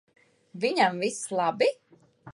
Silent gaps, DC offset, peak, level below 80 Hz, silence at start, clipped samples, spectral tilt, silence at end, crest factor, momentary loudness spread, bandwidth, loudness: none; under 0.1%; -10 dBFS; -76 dBFS; 0.55 s; under 0.1%; -3.5 dB/octave; 0 s; 18 dB; 15 LU; 11.5 kHz; -26 LUFS